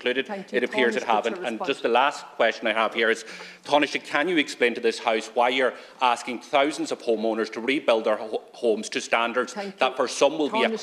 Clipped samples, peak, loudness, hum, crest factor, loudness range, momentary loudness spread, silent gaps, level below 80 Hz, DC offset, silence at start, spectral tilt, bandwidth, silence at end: under 0.1%; -6 dBFS; -24 LUFS; none; 20 dB; 2 LU; 6 LU; none; -84 dBFS; under 0.1%; 0 s; -3 dB/octave; 13 kHz; 0 s